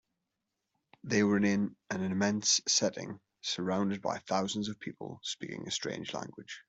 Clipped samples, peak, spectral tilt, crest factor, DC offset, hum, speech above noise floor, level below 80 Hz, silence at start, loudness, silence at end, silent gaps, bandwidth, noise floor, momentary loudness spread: under 0.1%; -14 dBFS; -3.5 dB/octave; 20 dB; under 0.1%; none; 53 dB; -72 dBFS; 1.05 s; -32 LUFS; 0.05 s; none; 8.2 kHz; -86 dBFS; 15 LU